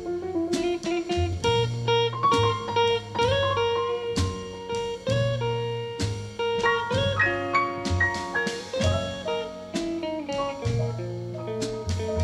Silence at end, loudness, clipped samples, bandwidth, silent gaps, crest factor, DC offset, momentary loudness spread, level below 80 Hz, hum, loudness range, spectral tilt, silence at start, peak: 0 s; -26 LUFS; under 0.1%; 12.5 kHz; none; 16 dB; under 0.1%; 8 LU; -46 dBFS; none; 5 LU; -5 dB/octave; 0 s; -10 dBFS